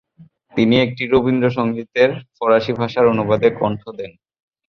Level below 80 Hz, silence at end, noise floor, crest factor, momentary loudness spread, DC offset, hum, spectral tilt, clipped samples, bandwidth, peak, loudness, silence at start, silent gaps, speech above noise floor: -52 dBFS; 0.6 s; -49 dBFS; 16 dB; 12 LU; under 0.1%; none; -7.5 dB/octave; under 0.1%; 6.4 kHz; -2 dBFS; -17 LUFS; 0.2 s; none; 32 dB